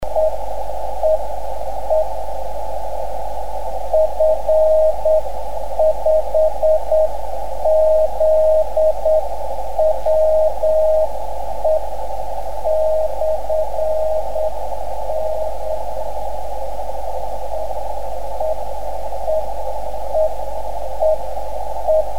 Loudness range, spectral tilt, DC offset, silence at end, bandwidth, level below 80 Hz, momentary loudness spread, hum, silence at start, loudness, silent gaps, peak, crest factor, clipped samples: 9 LU; -5.5 dB/octave; 10%; 0 s; 16.5 kHz; -34 dBFS; 12 LU; none; 0 s; -20 LUFS; none; -4 dBFS; 12 dB; under 0.1%